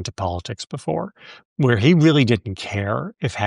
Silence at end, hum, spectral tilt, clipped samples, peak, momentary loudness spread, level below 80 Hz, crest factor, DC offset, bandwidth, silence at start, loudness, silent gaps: 0 s; none; -6.5 dB/octave; under 0.1%; -2 dBFS; 15 LU; -50 dBFS; 18 dB; under 0.1%; 11 kHz; 0 s; -20 LUFS; 1.45-1.56 s